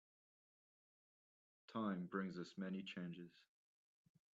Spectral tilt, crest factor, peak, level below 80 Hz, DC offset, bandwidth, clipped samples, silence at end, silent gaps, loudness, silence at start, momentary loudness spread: -5.5 dB/octave; 22 dB; -30 dBFS; -90 dBFS; under 0.1%; 7.6 kHz; under 0.1%; 0.9 s; none; -48 LUFS; 1.7 s; 9 LU